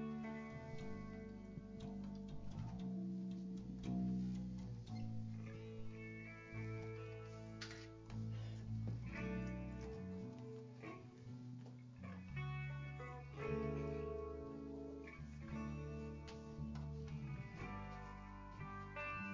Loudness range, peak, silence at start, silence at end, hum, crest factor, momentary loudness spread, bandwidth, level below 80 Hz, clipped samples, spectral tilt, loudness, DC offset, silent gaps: 4 LU; -32 dBFS; 0 s; 0 s; none; 16 dB; 8 LU; 7.6 kHz; -60 dBFS; under 0.1%; -7.5 dB/octave; -49 LUFS; under 0.1%; none